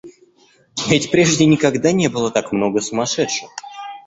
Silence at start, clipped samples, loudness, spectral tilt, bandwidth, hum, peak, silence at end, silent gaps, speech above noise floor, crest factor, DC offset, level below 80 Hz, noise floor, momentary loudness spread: 0.05 s; under 0.1%; -17 LUFS; -4.5 dB/octave; 8.2 kHz; none; -2 dBFS; 0.05 s; none; 38 dB; 16 dB; under 0.1%; -52 dBFS; -54 dBFS; 15 LU